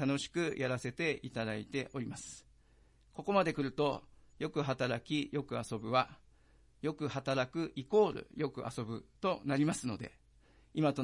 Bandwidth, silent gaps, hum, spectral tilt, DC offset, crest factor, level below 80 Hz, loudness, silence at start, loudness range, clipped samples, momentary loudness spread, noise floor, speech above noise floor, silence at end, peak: 11.5 kHz; none; none; -5.5 dB/octave; under 0.1%; 20 dB; -66 dBFS; -36 LUFS; 0 s; 2 LU; under 0.1%; 12 LU; -66 dBFS; 30 dB; 0 s; -16 dBFS